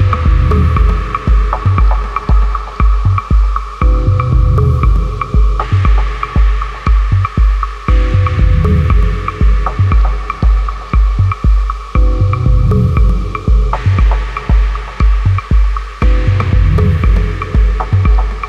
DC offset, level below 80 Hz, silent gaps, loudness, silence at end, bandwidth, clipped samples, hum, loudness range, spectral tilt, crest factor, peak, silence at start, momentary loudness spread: under 0.1%; -12 dBFS; none; -13 LUFS; 0 s; 6 kHz; under 0.1%; none; 1 LU; -8 dB/octave; 10 dB; -2 dBFS; 0 s; 5 LU